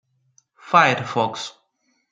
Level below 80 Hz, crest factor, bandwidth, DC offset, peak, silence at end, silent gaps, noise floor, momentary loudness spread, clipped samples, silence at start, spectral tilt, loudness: -68 dBFS; 22 dB; 9.4 kHz; under 0.1%; -2 dBFS; 0.6 s; none; -69 dBFS; 16 LU; under 0.1%; 0.65 s; -4 dB/octave; -19 LUFS